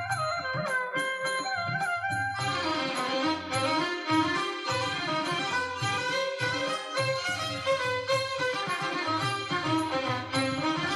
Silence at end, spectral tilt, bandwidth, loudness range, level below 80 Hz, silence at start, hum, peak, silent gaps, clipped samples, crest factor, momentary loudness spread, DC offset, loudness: 0 s; -4 dB/octave; 15 kHz; 1 LU; -66 dBFS; 0 s; none; -14 dBFS; none; under 0.1%; 16 dB; 2 LU; under 0.1%; -29 LUFS